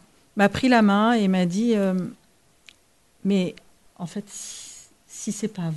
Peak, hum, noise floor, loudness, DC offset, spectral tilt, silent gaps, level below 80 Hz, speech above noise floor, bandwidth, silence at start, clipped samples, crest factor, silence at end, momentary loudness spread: -6 dBFS; none; -62 dBFS; -22 LUFS; under 0.1%; -5.5 dB/octave; none; -58 dBFS; 40 dB; 12 kHz; 0.35 s; under 0.1%; 18 dB; 0 s; 18 LU